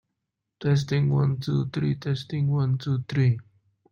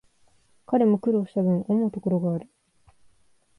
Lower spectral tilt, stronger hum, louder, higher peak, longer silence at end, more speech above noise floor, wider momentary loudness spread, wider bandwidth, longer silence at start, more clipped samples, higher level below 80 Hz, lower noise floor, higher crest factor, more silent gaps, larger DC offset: second, -8 dB/octave vs -11 dB/octave; neither; about the same, -25 LUFS vs -24 LUFS; about the same, -12 dBFS vs -10 dBFS; second, 0.5 s vs 1.15 s; first, 58 dB vs 39 dB; about the same, 6 LU vs 6 LU; second, 7 kHz vs 10.5 kHz; about the same, 0.6 s vs 0.7 s; neither; first, -58 dBFS vs -66 dBFS; first, -82 dBFS vs -62 dBFS; about the same, 14 dB vs 16 dB; neither; neither